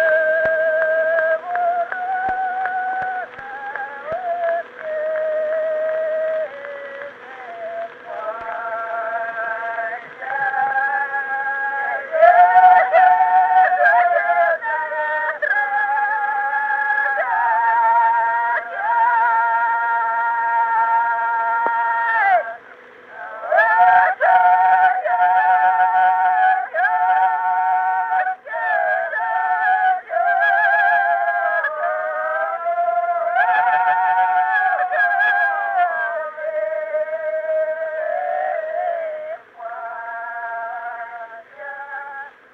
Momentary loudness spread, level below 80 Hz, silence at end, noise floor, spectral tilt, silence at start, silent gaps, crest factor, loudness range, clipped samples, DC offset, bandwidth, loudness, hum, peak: 16 LU; -68 dBFS; 0.25 s; -42 dBFS; -3.5 dB/octave; 0 s; none; 18 dB; 10 LU; under 0.1%; under 0.1%; 4.9 kHz; -18 LUFS; none; 0 dBFS